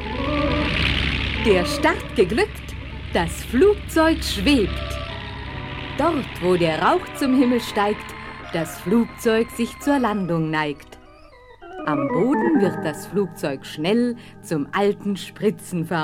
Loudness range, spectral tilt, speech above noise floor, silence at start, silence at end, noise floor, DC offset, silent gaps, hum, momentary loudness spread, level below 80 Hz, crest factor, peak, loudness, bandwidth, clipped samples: 3 LU; -5.5 dB/octave; 25 dB; 0 s; 0 s; -46 dBFS; under 0.1%; none; none; 11 LU; -36 dBFS; 18 dB; -4 dBFS; -21 LUFS; 16.5 kHz; under 0.1%